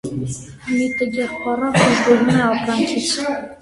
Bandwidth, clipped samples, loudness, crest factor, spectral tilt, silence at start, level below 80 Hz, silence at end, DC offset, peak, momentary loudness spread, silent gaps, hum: 11.5 kHz; under 0.1%; -18 LUFS; 18 dB; -4.5 dB/octave; 0.05 s; -48 dBFS; 0.05 s; under 0.1%; 0 dBFS; 11 LU; none; none